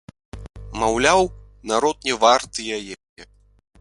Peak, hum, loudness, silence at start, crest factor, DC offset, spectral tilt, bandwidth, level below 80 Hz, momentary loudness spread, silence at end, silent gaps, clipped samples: 0 dBFS; none; -20 LUFS; 0.35 s; 22 dB; under 0.1%; -3 dB/octave; 11.5 kHz; -44 dBFS; 23 LU; 0.55 s; 3.09-3.16 s; under 0.1%